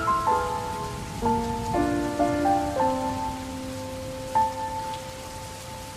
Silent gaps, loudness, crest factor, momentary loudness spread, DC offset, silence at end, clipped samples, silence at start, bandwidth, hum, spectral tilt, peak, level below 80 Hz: none; -27 LUFS; 16 dB; 12 LU; under 0.1%; 0 s; under 0.1%; 0 s; 16 kHz; none; -5.5 dB/octave; -12 dBFS; -44 dBFS